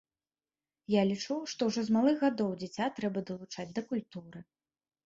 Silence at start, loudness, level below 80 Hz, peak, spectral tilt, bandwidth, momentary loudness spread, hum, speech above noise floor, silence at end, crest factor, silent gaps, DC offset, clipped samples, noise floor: 0.9 s; -32 LUFS; -74 dBFS; -14 dBFS; -5.5 dB/octave; 7.8 kHz; 19 LU; none; over 58 dB; 0.65 s; 18 dB; none; under 0.1%; under 0.1%; under -90 dBFS